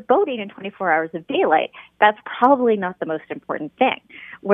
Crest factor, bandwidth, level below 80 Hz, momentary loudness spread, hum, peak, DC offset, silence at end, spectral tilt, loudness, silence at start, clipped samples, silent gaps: 20 dB; 3.8 kHz; -68 dBFS; 13 LU; none; 0 dBFS; under 0.1%; 0 s; -8 dB/octave; -20 LUFS; 0.1 s; under 0.1%; none